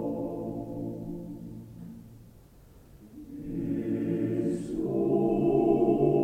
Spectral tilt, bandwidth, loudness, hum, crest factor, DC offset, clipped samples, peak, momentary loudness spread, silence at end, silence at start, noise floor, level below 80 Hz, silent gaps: -10 dB/octave; 9.4 kHz; -29 LUFS; none; 18 dB; under 0.1%; under 0.1%; -12 dBFS; 21 LU; 0 s; 0 s; -54 dBFS; -54 dBFS; none